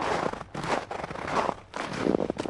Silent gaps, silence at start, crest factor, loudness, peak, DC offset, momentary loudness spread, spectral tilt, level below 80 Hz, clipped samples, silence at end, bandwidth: none; 0 s; 22 dB; -30 LUFS; -8 dBFS; under 0.1%; 8 LU; -5 dB/octave; -54 dBFS; under 0.1%; 0 s; 11.5 kHz